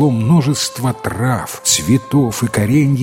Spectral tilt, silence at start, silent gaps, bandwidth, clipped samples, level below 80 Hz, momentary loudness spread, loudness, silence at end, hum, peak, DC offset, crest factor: -5 dB/octave; 0 s; none; 16.5 kHz; under 0.1%; -44 dBFS; 6 LU; -15 LUFS; 0 s; none; 0 dBFS; under 0.1%; 14 dB